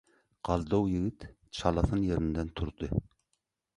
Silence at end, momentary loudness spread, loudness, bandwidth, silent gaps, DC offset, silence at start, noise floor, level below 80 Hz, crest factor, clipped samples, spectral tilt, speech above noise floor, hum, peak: 0.75 s; 9 LU; -32 LUFS; 11.5 kHz; none; under 0.1%; 0.45 s; -81 dBFS; -42 dBFS; 22 dB; under 0.1%; -7.5 dB/octave; 50 dB; none; -10 dBFS